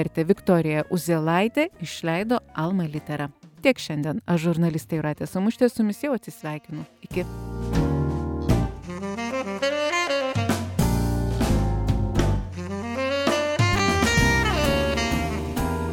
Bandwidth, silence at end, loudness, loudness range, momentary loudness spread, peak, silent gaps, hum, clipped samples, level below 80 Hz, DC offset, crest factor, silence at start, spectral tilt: 17.5 kHz; 0 s; -24 LUFS; 5 LU; 10 LU; -6 dBFS; none; none; under 0.1%; -34 dBFS; under 0.1%; 18 dB; 0 s; -5.5 dB/octave